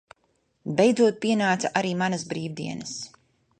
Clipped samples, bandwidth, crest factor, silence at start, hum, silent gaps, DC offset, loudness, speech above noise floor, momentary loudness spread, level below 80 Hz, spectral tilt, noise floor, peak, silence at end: under 0.1%; 9.6 kHz; 20 dB; 0.65 s; none; none; under 0.1%; -25 LUFS; 46 dB; 15 LU; -68 dBFS; -5 dB/octave; -70 dBFS; -6 dBFS; 0.5 s